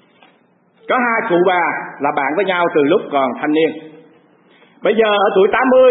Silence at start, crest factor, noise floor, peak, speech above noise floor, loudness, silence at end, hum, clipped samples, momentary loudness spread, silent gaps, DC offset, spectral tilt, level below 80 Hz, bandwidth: 0.9 s; 14 dB; -55 dBFS; -2 dBFS; 41 dB; -15 LUFS; 0 s; none; under 0.1%; 7 LU; none; under 0.1%; -10.5 dB/octave; -62 dBFS; 4 kHz